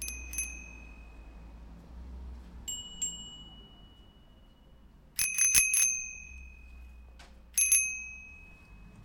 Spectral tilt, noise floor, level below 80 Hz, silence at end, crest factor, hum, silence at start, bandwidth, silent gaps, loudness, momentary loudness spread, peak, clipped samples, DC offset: 1 dB/octave; -57 dBFS; -50 dBFS; 0 s; 30 dB; none; 0 s; 17 kHz; none; -28 LUFS; 27 LU; -4 dBFS; under 0.1%; under 0.1%